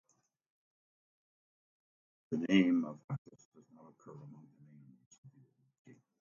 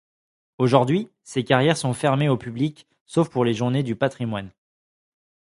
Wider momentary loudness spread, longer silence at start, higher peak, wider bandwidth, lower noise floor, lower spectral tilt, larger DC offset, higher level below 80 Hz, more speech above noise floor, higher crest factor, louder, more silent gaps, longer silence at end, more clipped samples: first, 27 LU vs 10 LU; first, 2.3 s vs 0.6 s; second, -16 dBFS vs 0 dBFS; second, 7.2 kHz vs 11.5 kHz; second, -68 dBFS vs under -90 dBFS; about the same, -5.5 dB/octave vs -6.5 dB/octave; neither; second, -80 dBFS vs -60 dBFS; second, 32 dB vs over 68 dB; about the same, 24 dB vs 22 dB; second, -34 LUFS vs -22 LUFS; first, 3.04-3.08 s, 3.18-3.25 s, 3.45-3.52 s, 5.06-5.11 s, 5.18-5.23 s vs 3.01-3.06 s; about the same, 0.9 s vs 1 s; neither